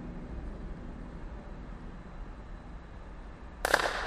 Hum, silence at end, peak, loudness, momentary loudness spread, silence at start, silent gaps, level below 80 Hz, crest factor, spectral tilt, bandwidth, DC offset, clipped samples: none; 0 s; -4 dBFS; -38 LUFS; 19 LU; 0 s; none; -44 dBFS; 34 dB; -3.5 dB/octave; 13 kHz; under 0.1%; under 0.1%